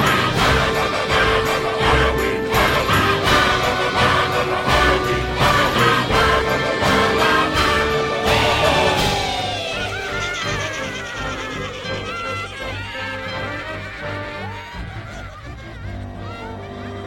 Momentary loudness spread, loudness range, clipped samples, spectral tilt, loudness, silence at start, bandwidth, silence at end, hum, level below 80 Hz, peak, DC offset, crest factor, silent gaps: 16 LU; 12 LU; under 0.1%; -4 dB/octave; -18 LUFS; 0 s; 16.5 kHz; 0 s; none; -32 dBFS; -2 dBFS; under 0.1%; 16 dB; none